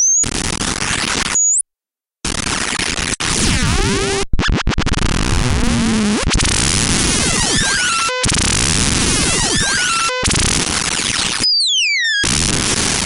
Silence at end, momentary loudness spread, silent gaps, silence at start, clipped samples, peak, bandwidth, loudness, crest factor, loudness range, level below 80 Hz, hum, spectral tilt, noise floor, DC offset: 0 s; 5 LU; none; 0 s; under 0.1%; -2 dBFS; 16.5 kHz; -14 LUFS; 14 dB; 3 LU; -24 dBFS; none; -2 dB/octave; -90 dBFS; under 0.1%